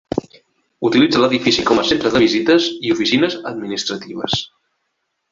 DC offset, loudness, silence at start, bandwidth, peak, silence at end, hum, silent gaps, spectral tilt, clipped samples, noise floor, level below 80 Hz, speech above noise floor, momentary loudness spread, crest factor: under 0.1%; -16 LUFS; 0.15 s; 7.6 kHz; -2 dBFS; 0.85 s; none; none; -4.5 dB/octave; under 0.1%; -72 dBFS; -50 dBFS; 56 dB; 11 LU; 16 dB